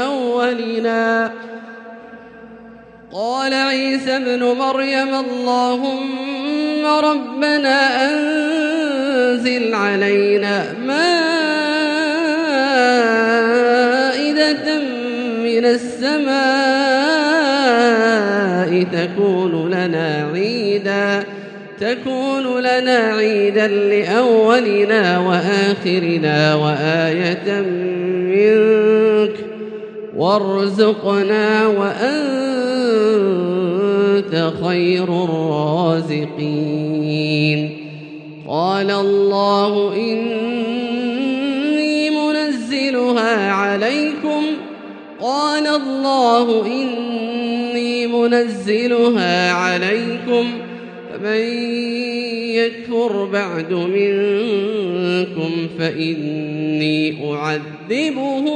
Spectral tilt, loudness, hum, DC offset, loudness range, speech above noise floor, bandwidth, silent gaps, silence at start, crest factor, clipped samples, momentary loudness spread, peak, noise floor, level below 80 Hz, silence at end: -5.5 dB/octave; -17 LUFS; none; under 0.1%; 5 LU; 24 dB; 10 kHz; none; 0 s; 16 dB; under 0.1%; 8 LU; 0 dBFS; -40 dBFS; -68 dBFS; 0 s